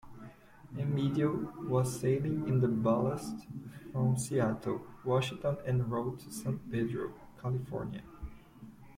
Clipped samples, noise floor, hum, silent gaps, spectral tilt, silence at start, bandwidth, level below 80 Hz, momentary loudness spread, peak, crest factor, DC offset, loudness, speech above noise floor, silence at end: under 0.1%; -53 dBFS; none; none; -7 dB/octave; 0.05 s; 16 kHz; -58 dBFS; 18 LU; -18 dBFS; 16 dB; under 0.1%; -34 LUFS; 20 dB; 0 s